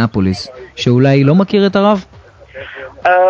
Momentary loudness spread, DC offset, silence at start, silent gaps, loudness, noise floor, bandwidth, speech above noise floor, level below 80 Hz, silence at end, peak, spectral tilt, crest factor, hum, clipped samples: 19 LU; under 0.1%; 0 s; none; -12 LUFS; -34 dBFS; 8 kHz; 23 dB; -40 dBFS; 0 s; 0 dBFS; -7.5 dB/octave; 12 dB; none; under 0.1%